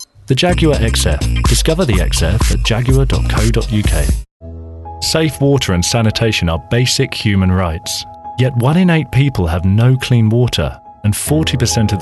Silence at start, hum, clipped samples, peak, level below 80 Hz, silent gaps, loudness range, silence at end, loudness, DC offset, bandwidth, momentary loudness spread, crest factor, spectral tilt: 0 s; none; under 0.1%; 0 dBFS; -20 dBFS; 4.31-4.40 s; 2 LU; 0 s; -14 LUFS; under 0.1%; 12.5 kHz; 8 LU; 12 dB; -5 dB/octave